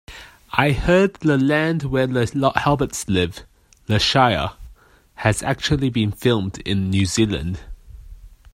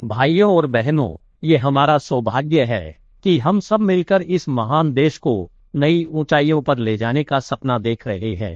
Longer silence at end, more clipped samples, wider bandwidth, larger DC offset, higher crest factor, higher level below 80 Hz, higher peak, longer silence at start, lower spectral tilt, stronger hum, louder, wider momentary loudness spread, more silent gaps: first, 0.25 s vs 0 s; neither; first, 16 kHz vs 7.6 kHz; neither; about the same, 20 dB vs 16 dB; first, -38 dBFS vs -50 dBFS; about the same, 0 dBFS vs -2 dBFS; about the same, 0.1 s vs 0 s; second, -5 dB/octave vs -7.5 dB/octave; neither; about the same, -20 LUFS vs -18 LUFS; about the same, 10 LU vs 9 LU; neither